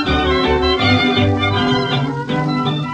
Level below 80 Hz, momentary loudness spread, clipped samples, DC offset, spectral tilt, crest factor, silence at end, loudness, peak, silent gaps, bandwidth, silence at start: -30 dBFS; 6 LU; under 0.1%; under 0.1%; -6.5 dB/octave; 12 dB; 0 s; -16 LUFS; -2 dBFS; none; 9.4 kHz; 0 s